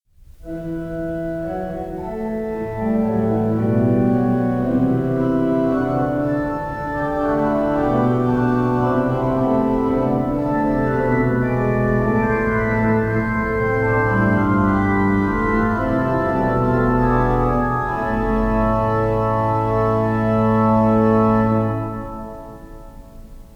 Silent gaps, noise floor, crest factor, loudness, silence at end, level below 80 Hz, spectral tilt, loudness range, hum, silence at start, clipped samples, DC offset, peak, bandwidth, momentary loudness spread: none; -39 dBFS; 14 dB; -19 LUFS; 0.15 s; -34 dBFS; -9.5 dB/octave; 2 LU; none; 0.2 s; under 0.1%; under 0.1%; -4 dBFS; 8.4 kHz; 9 LU